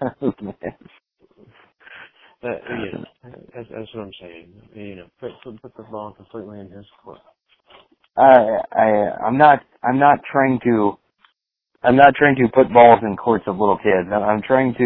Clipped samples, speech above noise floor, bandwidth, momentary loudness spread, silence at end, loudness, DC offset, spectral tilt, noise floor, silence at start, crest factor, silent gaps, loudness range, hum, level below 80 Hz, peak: under 0.1%; 53 dB; 4.2 kHz; 24 LU; 0 s; -15 LUFS; under 0.1%; -10.5 dB/octave; -70 dBFS; 0 s; 18 dB; none; 22 LU; none; -54 dBFS; 0 dBFS